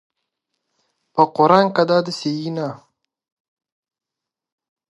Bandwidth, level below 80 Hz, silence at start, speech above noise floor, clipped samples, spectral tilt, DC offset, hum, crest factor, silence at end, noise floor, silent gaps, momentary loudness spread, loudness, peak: 11.5 kHz; -70 dBFS; 1.15 s; 69 dB; under 0.1%; -6 dB/octave; under 0.1%; none; 22 dB; 2.15 s; -86 dBFS; none; 13 LU; -18 LUFS; 0 dBFS